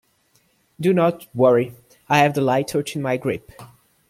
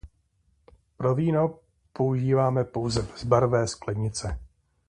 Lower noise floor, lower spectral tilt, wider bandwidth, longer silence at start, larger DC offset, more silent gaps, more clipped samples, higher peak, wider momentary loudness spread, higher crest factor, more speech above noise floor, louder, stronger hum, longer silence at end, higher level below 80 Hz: second, -62 dBFS vs -68 dBFS; about the same, -6 dB/octave vs -6.5 dB/octave; first, 16 kHz vs 10.5 kHz; first, 0.8 s vs 0.05 s; neither; neither; neither; first, -2 dBFS vs -6 dBFS; about the same, 8 LU vs 9 LU; about the same, 20 dB vs 20 dB; about the same, 43 dB vs 43 dB; first, -20 LUFS vs -26 LUFS; neither; about the same, 0.45 s vs 0.45 s; second, -60 dBFS vs -46 dBFS